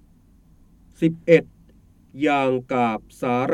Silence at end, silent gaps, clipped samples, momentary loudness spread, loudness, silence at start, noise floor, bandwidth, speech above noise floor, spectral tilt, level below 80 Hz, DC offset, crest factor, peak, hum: 0 s; none; under 0.1%; 7 LU; -21 LUFS; 1 s; -54 dBFS; 12 kHz; 33 dB; -7 dB/octave; -56 dBFS; under 0.1%; 22 dB; -2 dBFS; none